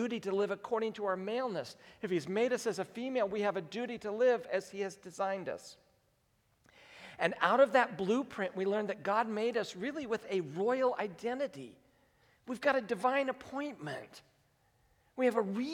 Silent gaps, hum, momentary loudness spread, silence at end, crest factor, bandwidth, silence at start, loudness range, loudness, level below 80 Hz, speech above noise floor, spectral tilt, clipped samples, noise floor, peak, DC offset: none; none; 13 LU; 0 s; 22 dB; 14.5 kHz; 0 s; 5 LU; -34 LUFS; -78 dBFS; 40 dB; -5 dB/octave; under 0.1%; -74 dBFS; -12 dBFS; under 0.1%